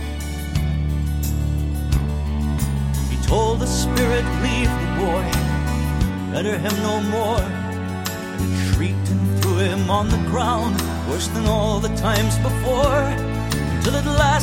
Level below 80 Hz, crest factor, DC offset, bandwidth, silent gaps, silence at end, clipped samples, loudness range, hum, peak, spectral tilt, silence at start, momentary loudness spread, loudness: -26 dBFS; 18 dB; under 0.1%; 17 kHz; none; 0 s; under 0.1%; 2 LU; none; -2 dBFS; -5.5 dB/octave; 0 s; 5 LU; -21 LUFS